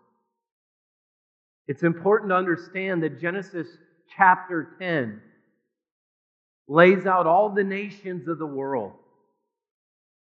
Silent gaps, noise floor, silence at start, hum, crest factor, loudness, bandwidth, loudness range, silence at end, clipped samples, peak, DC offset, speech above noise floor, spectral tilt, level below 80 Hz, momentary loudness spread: 5.91-6.65 s; -74 dBFS; 1.7 s; none; 24 dB; -23 LUFS; 7.2 kHz; 4 LU; 1.5 s; under 0.1%; 0 dBFS; under 0.1%; 51 dB; -5 dB/octave; -88 dBFS; 17 LU